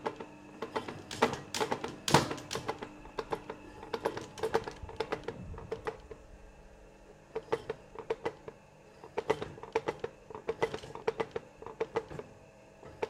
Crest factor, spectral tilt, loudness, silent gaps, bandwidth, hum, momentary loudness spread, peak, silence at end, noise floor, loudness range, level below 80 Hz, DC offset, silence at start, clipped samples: 30 dB; -4 dB/octave; -37 LUFS; none; 16 kHz; none; 21 LU; -8 dBFS; 0 s; -57 dBFS; 8 LU; -60 dBFS; under 0.1%; 0 s; under 0.1%